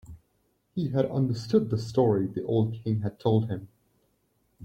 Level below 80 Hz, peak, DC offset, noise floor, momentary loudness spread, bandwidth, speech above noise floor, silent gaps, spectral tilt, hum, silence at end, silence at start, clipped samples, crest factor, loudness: -60 dBFS; -10 dBFS; under 0.1%; -71 dBFS; 8 LU; 8.8 kHz; 45 dB; none; -8.5 dB/octave; none; 0 s; 0.1 s; under 0.1%; 18 dB; -27 LUFS